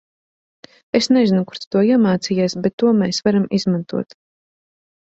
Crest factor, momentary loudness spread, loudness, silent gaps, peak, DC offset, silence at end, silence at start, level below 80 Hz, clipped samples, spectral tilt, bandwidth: 16 dB; 7 LU; -18 LUFS; 1.67-1.71 s, 2.73-2.78 s; -2 dBFS; under 0.1%; 1.05 s; 0.95 s; -58 dBFS; under 0.1%; -6 dB/octave; 8 kHz